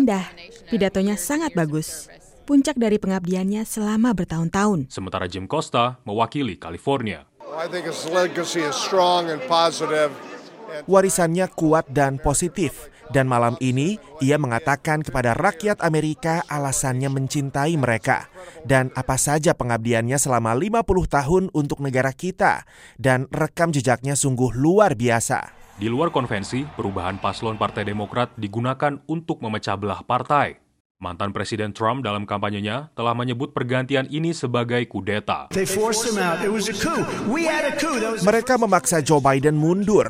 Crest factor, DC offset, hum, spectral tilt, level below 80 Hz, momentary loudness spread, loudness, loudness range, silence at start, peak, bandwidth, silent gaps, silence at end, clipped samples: 18 dB; under 0.1%; none; -5 dB/octave; -44 dBFS; 9 LU; -22 LUFS; 4 LU; 0 s; -2 dBFS; 16.5 kHz; 30.80-30.95 s; 0 s; under 0.1%